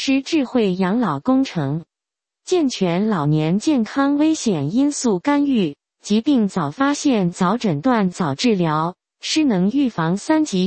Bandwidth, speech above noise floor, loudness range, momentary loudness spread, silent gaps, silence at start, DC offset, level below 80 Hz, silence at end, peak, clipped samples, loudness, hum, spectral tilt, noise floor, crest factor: 8.8 kHz; 69 dB; 2 LU; 5 LU; none; 0 s; under 0.1%; -58 dBFS; 0 s; -4 dBFS; under 0.1%; -19 LUFS; none; -5.5 dB/octave; -87 dBFS; 16 dB